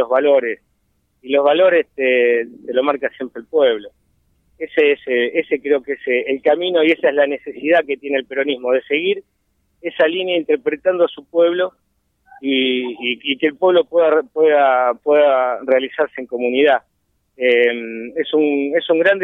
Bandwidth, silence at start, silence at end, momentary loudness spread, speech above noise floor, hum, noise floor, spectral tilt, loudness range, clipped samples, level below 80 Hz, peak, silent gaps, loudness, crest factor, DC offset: 4 kHz; 0 s; 0 s; 8 LU; 49 dB; none; -65 dBFS; -6.5 dB/octave; 4 LU; under 0.1%; -66 dBFS; -2 dBFS; none; -17 LUFS; 14 dB; under 0.1%